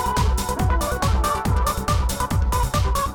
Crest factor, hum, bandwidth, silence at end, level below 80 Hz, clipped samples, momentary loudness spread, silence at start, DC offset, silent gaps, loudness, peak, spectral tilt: 8 dB; none; 19 kHz; 0 s; -24 dBFS; under 0.1%; 1 LU; 0 s; under 0.1%; none; -22 LUFS; -12 dBFS; -5 dB/octave